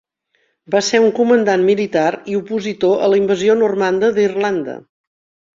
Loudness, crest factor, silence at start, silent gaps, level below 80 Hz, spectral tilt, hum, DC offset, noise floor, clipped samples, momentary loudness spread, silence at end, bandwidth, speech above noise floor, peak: -15 LUFS; 14 dB; 0.7 s; none; -60 dBFS; -5 dB/octave; none; under 0.1%; -65 dBFS; under 0.1%; 9 LU; 0.8 s; 7.8 kHz; 50 dB; -2 dBFS